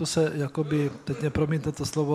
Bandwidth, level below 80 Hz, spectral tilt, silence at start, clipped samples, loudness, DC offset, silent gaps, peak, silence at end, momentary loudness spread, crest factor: 14 kHz; -52 dBFS; -6 dB/octave; 0 s; under 0.1%; -28 LUFS; under 0.1%; none; -10 dBFS; 0 s; 4 LU; 16 dB